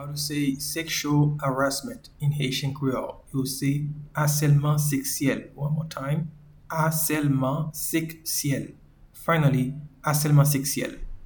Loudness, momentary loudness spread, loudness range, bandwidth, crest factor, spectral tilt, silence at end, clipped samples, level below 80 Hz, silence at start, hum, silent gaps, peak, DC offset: -25 LUFS; 10 LU; 2 LU; 19.5 kHz; 18 dB; -5 dB/octave; 0 s; under 0.1%; -50 dBFS; 0 s; none; none; -8 dBFS; under 0.1%